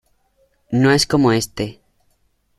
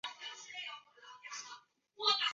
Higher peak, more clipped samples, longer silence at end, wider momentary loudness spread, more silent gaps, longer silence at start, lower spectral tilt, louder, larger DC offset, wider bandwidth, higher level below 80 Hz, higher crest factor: first, -2 dBFS vs -18 dBFS; neither; first, 0.85 s vs 0 s; second, 13 LU vs 21 LU; neither; first, 0.7 s vs 0.05 s; first, -5 dB/octave vs 5 dB/octave; first, -17 LUFS vs -39 LUFS; neither; first, 15 kHz vs 7.6 kHz; first, -46 dBFS vs under -90 dBFS; second, 18 dB vs 24 dB